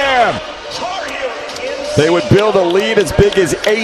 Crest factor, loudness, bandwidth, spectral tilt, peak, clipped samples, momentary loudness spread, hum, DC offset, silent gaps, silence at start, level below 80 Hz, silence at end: 14 dB; -14 LUFS; 14 kHz; -5 dB/octave; 0 dBFS; under 0.1%; 11 LU; none; under 0.1%; none; 0 s; -34 dBFS; 0 s